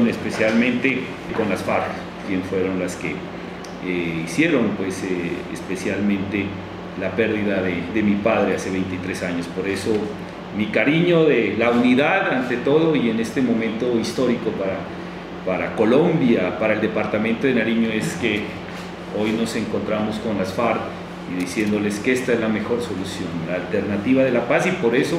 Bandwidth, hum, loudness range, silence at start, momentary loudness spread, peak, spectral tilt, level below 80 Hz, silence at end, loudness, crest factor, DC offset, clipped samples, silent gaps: 14.5 kHz; none; 5 LU; 0 s; 11 LU; -2 dBFS; -6 dB/octave; -52 dBFS; 0 s; -21 LUFS; 18 dB; under 0.1%; under 0.1%; none